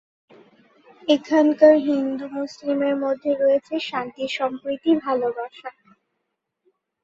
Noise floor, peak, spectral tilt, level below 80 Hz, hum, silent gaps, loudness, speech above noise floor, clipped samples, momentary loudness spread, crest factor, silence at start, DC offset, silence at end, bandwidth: -78 dBFS; -2 dBFS; -5 dB/octave; -68 dBFS; none; none; -21 LUFS; 58 dB; under 0.1%; 15 LU; 20 dB; 1.05 s; under 0.1%; 1.35 s; 7.6 kHz